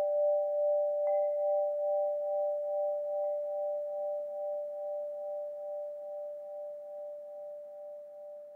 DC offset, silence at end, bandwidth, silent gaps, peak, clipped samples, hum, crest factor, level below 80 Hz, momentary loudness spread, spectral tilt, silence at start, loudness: under 0.1%; 0 s; 2.2 kHz; none; -22 dBFS; under 0.1%; none; 12 dB; under -90 dBFS; 15 LU; -5 dB/octave; 0 s; -34 LUFS